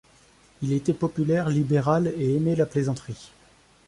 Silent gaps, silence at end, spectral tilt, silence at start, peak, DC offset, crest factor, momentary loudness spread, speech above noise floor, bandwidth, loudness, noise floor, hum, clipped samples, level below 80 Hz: none; 0.6 s; -8 dB/octave; 0.6 s; -8 dBFS; under 0.1%; 18 dB; 11 LU; 33 dB; 11.5 kHz; -24 LUFS; -57 dBFS; none; under 0.1%; -56 dBFS